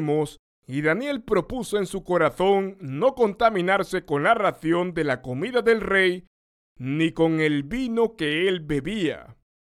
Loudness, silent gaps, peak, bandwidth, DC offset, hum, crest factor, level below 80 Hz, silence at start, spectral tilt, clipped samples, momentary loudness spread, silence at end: -23 LUFS; 0.39-0.62 s, 6.27-6.75 s; -6 dBFS; 14.5 kHz; under 0.1%; none; 18 dB; -50 dBFS; 0 s; -6 dB/octave; under 0.1%; 7 LU; 0.35 s